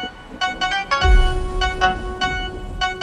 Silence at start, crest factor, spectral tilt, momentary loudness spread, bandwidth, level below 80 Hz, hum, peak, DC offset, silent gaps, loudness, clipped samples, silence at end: 0 s; 16 dB; -4 dB/octave; 9 LU; 10.5 kHz; -22 dBFS; none; -2 dBFS; under 0.1%; none; -21 LUFS; under 0.1%; 0 s